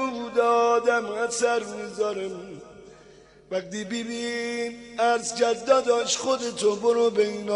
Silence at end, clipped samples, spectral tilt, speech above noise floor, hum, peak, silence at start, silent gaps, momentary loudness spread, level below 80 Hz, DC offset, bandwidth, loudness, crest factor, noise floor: 0 s; under 0.1%; -2.5 dB/octave; 27 dB; none; -8 dBFS; 0 s; none; 12 LU; -64 dBFS; under 0.1%; 11 kHz; -25 LUFS; 18 dB; -52 dBFS